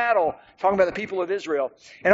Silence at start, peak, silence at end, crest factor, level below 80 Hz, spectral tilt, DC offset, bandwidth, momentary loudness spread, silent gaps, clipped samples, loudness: 0 s; -2 dBFS; 0 s; 22 dB; -60 dBFS; -3.5 dB/octave; under 0.1%; 7.6 kHz; 7 LU; none; under 0.1%; -24 LUFS